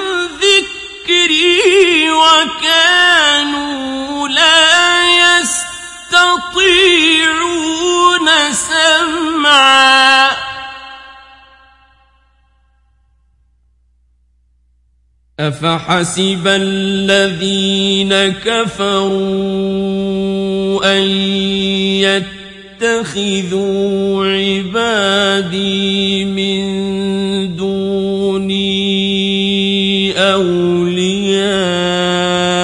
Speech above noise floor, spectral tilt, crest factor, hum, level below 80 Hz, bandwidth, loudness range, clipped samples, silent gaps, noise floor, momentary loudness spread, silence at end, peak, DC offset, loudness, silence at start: 42 dB; -3 dB/octave; 14 dB; none; -48 dBFS; 12 kHz; 7 LU; under 0.1%; none; -55 dBFS; 10 LU; 0 s; 0 dBFS; under 0.1%; -11 LUFS; 0 s